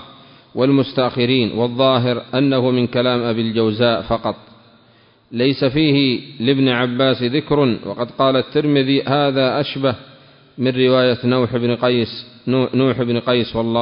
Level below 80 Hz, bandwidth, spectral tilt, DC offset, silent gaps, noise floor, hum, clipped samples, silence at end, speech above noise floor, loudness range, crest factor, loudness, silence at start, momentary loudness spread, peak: -50 dBFS; 5.4 kHz; -11.5 dB/octave; under 0.1%; none; -52 dBFS; none; under 0.1%; 0 s; 35 dB; 2 LU; 16 dB; -17 LUFS; 0 s; 6 LU; -2 dBFS